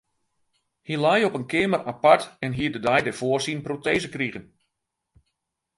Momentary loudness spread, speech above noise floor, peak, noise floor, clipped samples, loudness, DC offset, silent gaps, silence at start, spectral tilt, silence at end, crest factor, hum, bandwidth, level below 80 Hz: 11 LU; 57 dB; -2 dBFS; -81 dBFS; under 0.1%; -23 LUFS; under 0.1%; none; 0.9 s; -5 dB/octave; 1.35 s; 24 dB; none; 11.5 kHz; -58 dBFS